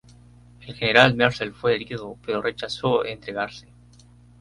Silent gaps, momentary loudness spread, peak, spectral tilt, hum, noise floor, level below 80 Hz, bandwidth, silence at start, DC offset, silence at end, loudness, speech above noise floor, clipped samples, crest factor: none; 16 LU; 0 dBFS; -5.5 dB/octave; 60 Hz at -45 dBFS; -51 dBFS; -54 dBFS; 11.5 kHz; 0.6 s; under 0.1%; 0.8 s; -22 LUFS; 28 dB; under 0.1%; 24 dB